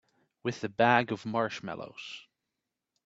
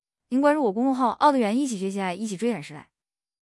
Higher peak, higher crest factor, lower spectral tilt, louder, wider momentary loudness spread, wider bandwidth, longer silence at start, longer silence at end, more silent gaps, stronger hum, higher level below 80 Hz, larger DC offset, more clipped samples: about the same, -8 dBFS vs -6 dBFS; first, 24 dB vs 18 dB; about the same, -5.5 dB/octave vs -5.5 dB/octave; second, -30 LUFS vs -24 LUFS; first, 18 LU vs 9 LU; second, 8 kHz vs 12 kHz; first, 0.45 s vs 0.3 s; first, 0.85 s vs 0.6 s; neither; neither; about the same, -74 dBFS vs -72 dBFS; neither; neither